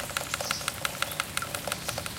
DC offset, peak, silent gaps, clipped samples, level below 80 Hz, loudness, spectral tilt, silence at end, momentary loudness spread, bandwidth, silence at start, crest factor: under 0.1%; -8 dBFS; none; under 0.1%; -54 dBFS; -31 LUFS; -1.5 dB/octave; 0 s; 2 LU; 17 kHz; 0 s; 26 dB